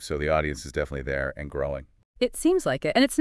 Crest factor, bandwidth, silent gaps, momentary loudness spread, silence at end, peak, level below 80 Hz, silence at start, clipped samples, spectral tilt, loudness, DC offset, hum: 18 dB; 12 kHz; 2.05-2.14 s; 9 LU; 0 s; -8 dBFS; -42 dBFS; 0 s; under 0.1%; -5 dB/octave; -26 LUFS; under 0.1%; none